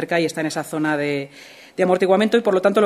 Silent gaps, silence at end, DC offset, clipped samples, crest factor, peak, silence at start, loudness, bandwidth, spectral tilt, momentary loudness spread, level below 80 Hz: none; 0 s; under 0.1%; under 0.1%; 16 dB; -2 dBFS; 0 s; -20 LUFS; 15 kHz; -5.5 dB/octave; 10 LU; -68 dBFS